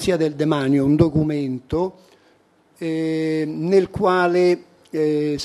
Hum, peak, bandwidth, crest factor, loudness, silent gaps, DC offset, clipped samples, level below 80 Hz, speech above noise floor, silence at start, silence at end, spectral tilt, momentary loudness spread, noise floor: none; 0 dBFS; 12.5 kHz; 20 dB; -20 LUFS; none; under 0.1%; under 0.1%; -48 dBFS; 38 dB; 0 s; 0 s; -7 dB/octave; 9 LU; -57 dBFS